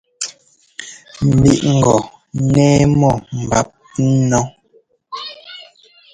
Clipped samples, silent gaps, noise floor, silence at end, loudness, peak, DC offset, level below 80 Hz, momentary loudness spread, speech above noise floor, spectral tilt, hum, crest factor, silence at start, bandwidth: under 0.1%; none; -55 dBFS; 0.5 s; -15 LUFS; 0 dBFS; under 0.1%; -38 dBFS; 21 LU; 42 dB; -6 dB/octave; none; 16 dB; 0.2 s; 10 kHz